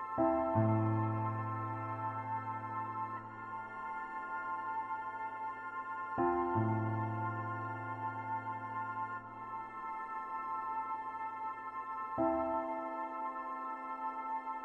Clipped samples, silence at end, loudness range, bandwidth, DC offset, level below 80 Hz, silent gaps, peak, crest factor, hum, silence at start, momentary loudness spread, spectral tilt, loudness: under 0.1%; 0 s; 4 LU; 5.6 kHz; under 0.1%; -70 dBFS; none; -18 dBFS; 18 dB; none; 0 s; 10 LU; -10 dB/octave; -38 LUFS